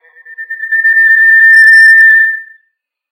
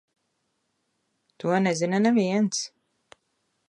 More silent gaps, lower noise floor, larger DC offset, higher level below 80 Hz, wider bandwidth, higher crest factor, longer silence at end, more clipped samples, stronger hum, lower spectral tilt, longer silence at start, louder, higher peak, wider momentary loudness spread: neither; second, -64 dBFS vs -75 dBFS; neither; second, -82 dBFS vs -76 dBFS; first, 16.5 kHz vs 10.5 kHz; second, 8 dB vs 18 dB; second, 0.7 s vs 1 s; first, 2% vs under 0.1%; neither; second, 6.5 dB/octave vs -5 dB/octave; second, 0.3 s vs 1.45 s; first, -3 LUFS vs -24 LUFS; first, 0 dBFS vs -10 dBFS; first, 18 LU vs 10 LU